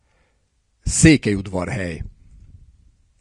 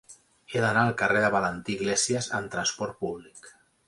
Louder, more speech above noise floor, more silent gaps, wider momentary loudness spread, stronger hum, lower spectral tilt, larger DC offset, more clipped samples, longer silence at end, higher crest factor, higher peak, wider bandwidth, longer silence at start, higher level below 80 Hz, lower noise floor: first, -18 LUFS vs -26 LUFS; first, 48 dB vs 23 dB; neither; first, 20 LU vs 10 LU; neither; first, -5 dB/octave vs -3.5 dB/octave; neither; neither; first, 1.1 s vs 0.4 s; about the same, 22 dB vs 20 dB; first, 0 dBFS vs -8 dBFS; about the same, 12 kHz vs 11.5 kHz; first, 0.85 s vs 0.1 s; first, -36 dBFS vs -60 dBFS; first, -65 dBFS vs -50 dBFS